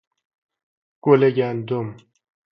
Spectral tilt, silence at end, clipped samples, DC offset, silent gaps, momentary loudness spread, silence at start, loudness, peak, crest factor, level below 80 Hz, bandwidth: -9.5 dB/octave; 0.6 s; under 0.1%; under 0.1%; none; 11 LU; 1.05 s; -20 LUFS; -2 dBFS; 22 dB; -66 dBFS; 5.6 kHz